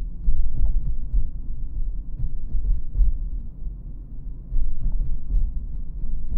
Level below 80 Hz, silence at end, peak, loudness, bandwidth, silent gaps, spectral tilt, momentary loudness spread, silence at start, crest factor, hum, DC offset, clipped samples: -22 dBFS; 0 s; -6 dBFS; -31 LUFS; 0.7 kHz; none; -12 dB/octave; 11 LU; 0 s; 12 dB; none; under 0.1%; under 0.1%